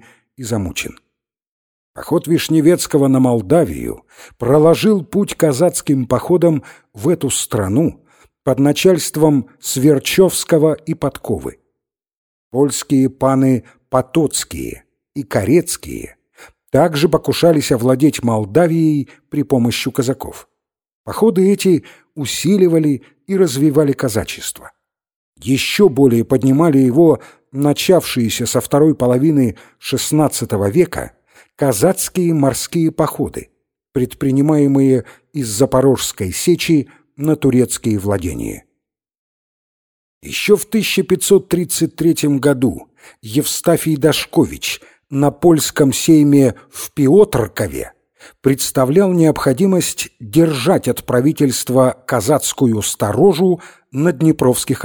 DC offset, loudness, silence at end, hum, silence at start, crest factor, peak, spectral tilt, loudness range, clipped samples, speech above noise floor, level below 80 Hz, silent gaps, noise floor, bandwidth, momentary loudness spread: under 0.1%; -15 LUFS; 0 s; none; 0.4 s; 14 dB; 0 dBFS; -5.5 dB/octave; 4 LU; under 0.1%; 62 dB; -46 dBFS; 1.51-1.94 s, 12.17-12.51 s, 20.95-21.04 s, 25.16-25.33 s, 39.18-40.21 s; -76 dBFS; over 20 kHz; 11 LU